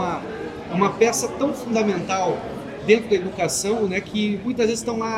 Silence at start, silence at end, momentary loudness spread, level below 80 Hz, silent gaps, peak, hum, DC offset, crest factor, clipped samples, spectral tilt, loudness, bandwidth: 0 s; 0 s; 10 LU; -52 dBFS; none; -2 dBFS; none; under 0.1%; 20 dB; under 0.1%; -4.5 dB/octave; -22 LUFS; 16 kHz